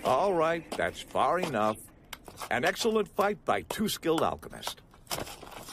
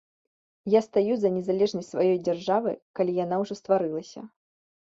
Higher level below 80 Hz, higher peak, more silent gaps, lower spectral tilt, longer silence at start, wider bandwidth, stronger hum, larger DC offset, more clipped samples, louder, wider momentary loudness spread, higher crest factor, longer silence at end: first, -58 dBFS vs -70 dBFS; second, -14 dBFS vs -10 dBFS; second, none vs 2.82-2.94 s; second, -4 dB/octave vs -7 dB/octave; second, 0 s vs 0.65 s; first, 15.5 kHz vs 7.8 kHz; neither; neither; neither; second, -30 LUFS vs -26 LUFS; first, 15 LU vs 9 LU; about the same, 18 dB vs 18 dB; second, 0 s vs 0.6 s